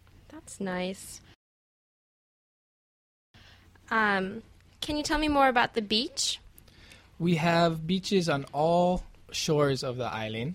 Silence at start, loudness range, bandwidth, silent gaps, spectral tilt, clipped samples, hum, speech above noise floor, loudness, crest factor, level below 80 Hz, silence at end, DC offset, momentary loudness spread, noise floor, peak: 0.3 s; 14 LU; 15.5 kHz; 1.35-3.34 s; -4.5 dB/octave; under 0.1%; none; 28 dB; -28 LUFS; 20 dB; -52 dBFS; 0 s; under 0.1%; 14 LU; -56 dBFS; -10 dBFS